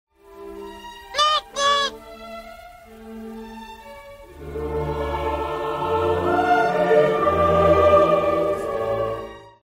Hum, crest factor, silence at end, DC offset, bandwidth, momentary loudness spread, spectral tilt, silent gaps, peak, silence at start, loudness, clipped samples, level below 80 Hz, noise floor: none; 18 dB; 0.2 s; under 0.1%; 16 kHz; 23 LU; -4.5 dB/octave; none; -4 dBFS; 0.3 s; -20 LUFS; under 0.1%; -42 dBFS; -43 dBFS